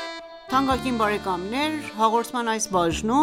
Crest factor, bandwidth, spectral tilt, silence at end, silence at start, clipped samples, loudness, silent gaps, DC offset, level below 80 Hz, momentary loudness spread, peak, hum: 18 dB; 16.5 kHz; -4 dB/octave; 0 s; 0 s; under 0.1%; -24 LUFS; none; under 0.1%; -46 dBFS; 5 LU; -6 dBFS; none